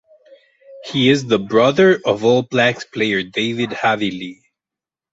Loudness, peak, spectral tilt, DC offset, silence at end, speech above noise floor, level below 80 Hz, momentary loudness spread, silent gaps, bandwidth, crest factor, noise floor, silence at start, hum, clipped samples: -16 LUFS; 0 dBFS; -5.5 dB/octave; under 0.1%; 0.8 s; 72 dB; -58 dBFS; 10 LU; none; 8 kHz; 18 dB; -88 dBFS; 0.7 s; none; under 0.1%